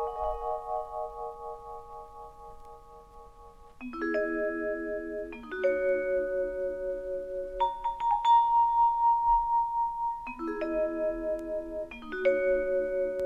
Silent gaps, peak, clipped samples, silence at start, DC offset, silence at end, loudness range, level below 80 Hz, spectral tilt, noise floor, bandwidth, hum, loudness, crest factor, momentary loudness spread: none; -16 dBFS; under 0.1%; 0 s; under 0.1%; 0 s; 12 LU; -52 dBFS; -6 dB/octave; -51 dBFS; 7.2 kHz; none; -29 LUFS; 14 dB; 18 LU